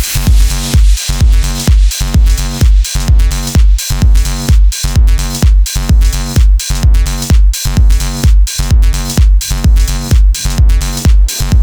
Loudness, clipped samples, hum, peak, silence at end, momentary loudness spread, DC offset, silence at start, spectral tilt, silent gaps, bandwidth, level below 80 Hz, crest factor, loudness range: -11 LUFS; under 0.1%; none; 0 dBFS; 0 s; 2 LU; under 0.1%; 0 s; -4.5 dB/octave; none; over 20 kHz; -8 dBFS; 8 dB; 0 LU